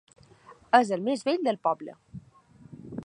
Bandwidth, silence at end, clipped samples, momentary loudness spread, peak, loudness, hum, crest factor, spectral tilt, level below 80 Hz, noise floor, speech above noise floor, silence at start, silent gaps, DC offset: 10.5 kHz; 0 s; under 0.1%; 25 LU; -4 dBFS; -26 LUFS; none; 24 dB; -5 dB/octave; -66 dBFS; -55 dBFS; 29 dB; 0.5 s; none; under 0.1%